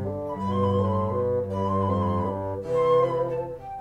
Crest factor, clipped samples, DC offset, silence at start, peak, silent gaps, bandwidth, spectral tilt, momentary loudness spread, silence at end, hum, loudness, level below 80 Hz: 14 dB; under 0.1%; under 0.1%; 0 s; -12 dBFS; none; 8.6 kHz; -9 dB/octave; 9 LU; 0 s; none; -25 LUFS; -52 dBFS